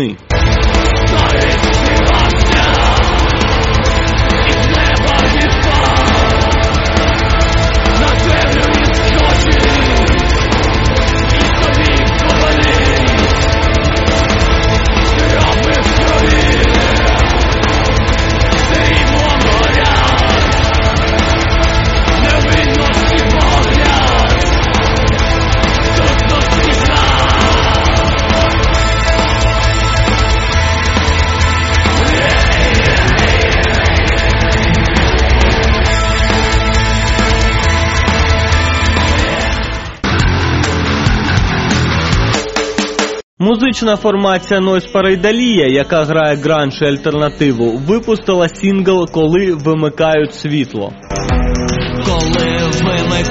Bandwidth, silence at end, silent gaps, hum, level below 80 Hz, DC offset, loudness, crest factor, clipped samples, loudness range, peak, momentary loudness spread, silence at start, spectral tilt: 8 kHz; 0 s; 43.23-43.37 s; none; -16 dBFS; 0.3%; -11 LUFS; 10 dB; under 0.1%; 2 LU; 0 dBFS; 3 LU; 0 s; -5 dB/octave